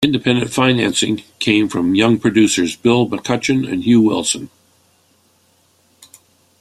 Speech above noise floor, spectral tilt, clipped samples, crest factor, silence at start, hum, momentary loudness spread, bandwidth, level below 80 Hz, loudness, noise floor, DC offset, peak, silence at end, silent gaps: 42 dB; -4.5 dB/octave; under 0.1%; 16 dB; 0 s; none; 6 LU; 14 kHz; -52 dBFS; -15 LUFS; -57 dBFS; under 0.1%; -2 dBFS; 2.15 s; none